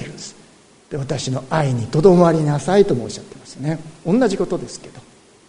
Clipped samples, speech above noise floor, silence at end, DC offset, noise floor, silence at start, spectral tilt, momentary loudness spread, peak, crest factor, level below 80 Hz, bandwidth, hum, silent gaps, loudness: under 0.1%; 31 dB; 0.5 s; under 0.1%; -49 dBFS; 0 s; -6.5 dB/octave; 20 LU; 0 dBFS; 18 dB; -46 dBFS; 11 kHz; none; none; -18 LUFS